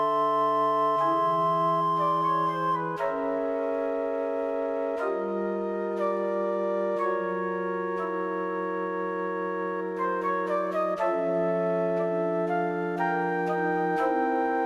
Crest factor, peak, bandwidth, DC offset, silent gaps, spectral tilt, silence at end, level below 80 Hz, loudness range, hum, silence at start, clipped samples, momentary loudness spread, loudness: 12 dB; -14 dBFS; 12.5 kHz; under 0.1%; none; -7.5 dB/octave; 0 s; -68 dBFS; 4 LU; none; 0 s; under 0.1%; 6 LU; -27 LUFS